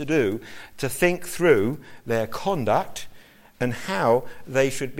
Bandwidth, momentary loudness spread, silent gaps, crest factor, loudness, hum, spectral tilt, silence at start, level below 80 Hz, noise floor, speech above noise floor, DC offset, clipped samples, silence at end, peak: 16.5 kHz; 15 LU; none; 18 dB; -24 LUFS; none; -5 dB/octave; 0 s; -50 dBFS; -47 dBFS; 24 dB; under 0.1%; under 0.1%; 0 s; -6 dBFS